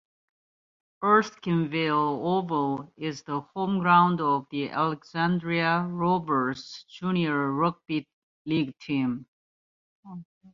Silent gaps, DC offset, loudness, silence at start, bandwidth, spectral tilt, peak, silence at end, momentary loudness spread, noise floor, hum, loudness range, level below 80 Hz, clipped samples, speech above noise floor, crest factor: 8.13-8.45 s, 9.28-10.03 s, 10.25-10.41 s; under 0.1%; -26 LUFS; 1 s; 7.4 kHz; -7 dB/octave; -6 dBFS; 0.05 s; 12 LU; under -90 dBFS; none; 5 LU; -68 dBFS; under 0.1%; over 64 dB; 20 dB